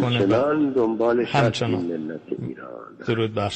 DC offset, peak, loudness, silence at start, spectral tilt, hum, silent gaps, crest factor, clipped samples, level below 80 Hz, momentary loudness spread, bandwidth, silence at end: under 0.1%; -8 dBFS; -22 LUFS; 0 s; -6.5 dB/octave; none; none; 16 dB; under 0.1%; -56 dBFS; 14 LU; 8.8 kHz; 0 s